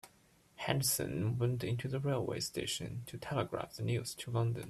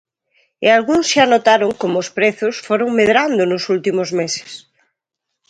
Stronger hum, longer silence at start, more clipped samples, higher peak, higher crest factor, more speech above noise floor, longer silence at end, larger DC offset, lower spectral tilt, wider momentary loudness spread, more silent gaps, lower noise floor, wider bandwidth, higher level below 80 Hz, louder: neither; second, 0.05 s vs 0.6 s; neither; second, -16 dBFS vs 0 dBFS; first, 22 dB vs 16 dB; second, 31 dB vs 63 dB; second, 0 s vs 0.9 s; neither; about the same, -4.5 dB/octave vs -3.5 dB/octave; about the same, 7 LU vs 9 LU; neither; second, -67 dBFS vs -78 dBFS; first, 14.5 kHz vs 10.5 kHz; second, -64 dBFS vs -58 dBFS; second, -37 LUFS vs -15 LUFS